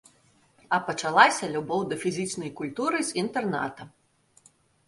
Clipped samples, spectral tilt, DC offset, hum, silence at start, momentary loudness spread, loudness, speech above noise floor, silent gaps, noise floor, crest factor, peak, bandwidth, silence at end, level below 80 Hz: under 0.1%; -3.5 dB/octave; under 0.1%; none; 0.7 s; 14 LU; -26 LUFS; 36 dB; none; -62 dBFS; 26 dB; -2 dBFS; 11.5 kHz; 1 s; -68 dBFS